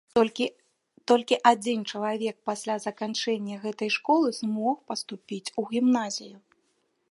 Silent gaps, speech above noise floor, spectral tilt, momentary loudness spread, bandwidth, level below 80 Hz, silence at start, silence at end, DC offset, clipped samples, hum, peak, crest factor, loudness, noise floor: none; 46 dB; -4 dB/octave; 12 LU; 11.5 kHz; -74 dBFS; 0.15 s; 0.75 s; under 0.1%; under 0.1%; none; -4 dBFS; 24 dB; -27 LUFS; -72 dBFS